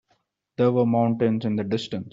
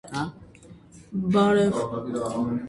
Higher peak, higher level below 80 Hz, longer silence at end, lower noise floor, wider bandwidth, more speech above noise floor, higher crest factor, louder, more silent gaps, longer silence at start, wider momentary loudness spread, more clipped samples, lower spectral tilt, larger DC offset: about the same, -8 dBFS vs -10 dBFS; second, -64 dBFS vs -56 dBFS; about the same, 0.05 s vs 0 s; first, -70 dBFS vs -49 dBFS; second, 7.8 kHz vs 11.5 kHz; first, 48 dB vs 25 dB; about the same, 14 dB vs 16 dB; about the same, -23 LUFS vs -25 LUFS; neither; first, 0.6 s vs 0.05 s; second, 7 LU vs 13 LU; neither; about the same, -7 dB/octave vs -6.5 dB/octave; neither